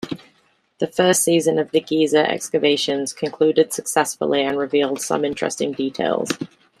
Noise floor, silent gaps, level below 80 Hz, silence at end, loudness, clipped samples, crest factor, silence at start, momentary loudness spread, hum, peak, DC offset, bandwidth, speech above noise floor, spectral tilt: -61 dBFS; none; -64 dBFS; 0.35 s; -20 LUFS; under 0.1%; 18 dB; 0 s; 9 LU; none; -2 dBFS; under 0.1%; 15 kHz; 42 dB; -3.5 dB/octave